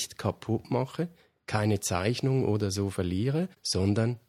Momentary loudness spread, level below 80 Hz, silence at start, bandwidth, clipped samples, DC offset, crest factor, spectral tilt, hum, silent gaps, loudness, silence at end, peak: 7 LU; -58 dBFS; 0 s; 15.5 kHz; under 0.1%; under 0.1%; 20 dB; -5.5 dB/octave; none; none; -29 LUFS; 0.1 s; -8 dBFS